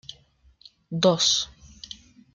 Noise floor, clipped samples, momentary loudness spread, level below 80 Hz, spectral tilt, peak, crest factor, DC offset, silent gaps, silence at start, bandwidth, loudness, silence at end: -58 dBFS; under 0.1%; 24 LU; -58 dBFS; -3 dB/octave; -6 dBFS; 22 dB; under 0.1%; none; 0.1 s; 10 kHz; -22 LUFS; 0.4 s